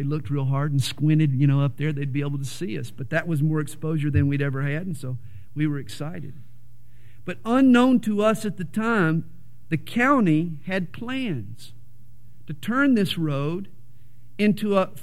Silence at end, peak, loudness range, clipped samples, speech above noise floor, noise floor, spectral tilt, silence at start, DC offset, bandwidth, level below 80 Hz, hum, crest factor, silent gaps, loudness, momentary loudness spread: 0 s; -6 dBFS; 5 LU; under 0.1%; 29 dB; -52 dBFS; -7 dB/octave; 0 s; 2%; 14.5 kHz; -56 dBFS; none; 18 dB; none; -24 LUFS; 14 LU